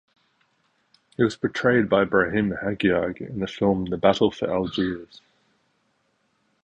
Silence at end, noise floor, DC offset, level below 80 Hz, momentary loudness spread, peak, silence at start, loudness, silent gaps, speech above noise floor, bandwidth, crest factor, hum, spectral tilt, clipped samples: 1.6 s; -69 dBFS; under 0.1%; -52 dBFS; 10 LU; -4 dBFS; 1.2 s; -23 LUFS; none; 47 dB; 8.8 kHz; 20 dB; none; -6.5 dB/octave; under 0.1%